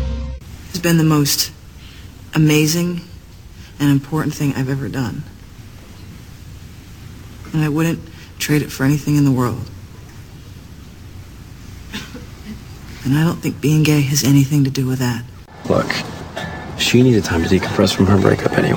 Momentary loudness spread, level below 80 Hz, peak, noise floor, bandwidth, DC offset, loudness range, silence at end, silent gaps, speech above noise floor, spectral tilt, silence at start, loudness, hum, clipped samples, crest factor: 24 LU; -38 dBFS; 0 dBFS; -38 dBFS; 18.5 kHz; under 0.1%; 9 LU; 0 s; none; 22 dB; -5.5 dB/octave; 0 s; -17 LUFS; none; under 0.1%; 18 dB